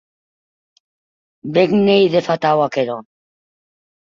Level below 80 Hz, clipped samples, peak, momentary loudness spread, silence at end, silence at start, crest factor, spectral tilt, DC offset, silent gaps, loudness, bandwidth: -60 dBFS; under 0.1%; -2 dBFS; 12 LU; 1.15 s; 1.45 s; 18 dB; -7 dB/octave; under 0.1%; none; -16 LUFS; 7.4 kHz